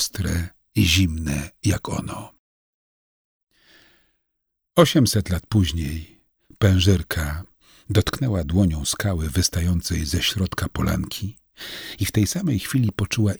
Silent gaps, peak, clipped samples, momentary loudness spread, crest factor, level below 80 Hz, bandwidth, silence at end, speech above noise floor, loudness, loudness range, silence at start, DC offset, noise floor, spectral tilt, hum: 2.39-3.47 s; -2 dBFS; under 0.1%; 12 LU; 20 dB; -36 dBFS; over 20 kHz; 0 s; 57 dB; -22 LUFS; 5 LU; 0 s; under 0.1%; -78 dBFS; -5 dB/octave; none